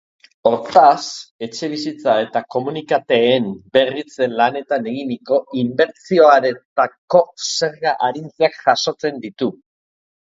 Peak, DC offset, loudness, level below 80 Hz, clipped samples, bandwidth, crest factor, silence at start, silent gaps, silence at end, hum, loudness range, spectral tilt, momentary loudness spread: 0 dBFS; under 0.1%; -17 LUFS; -64 dBFS; under 0.1%; 7.8 kHz; 18 dB; 0.45 s; 1.31-1.39 s, 6.65-6.76 s, 6.98-7.08 s; 0.75 s; none; 3 LU; -4 dB/octave; 12 LU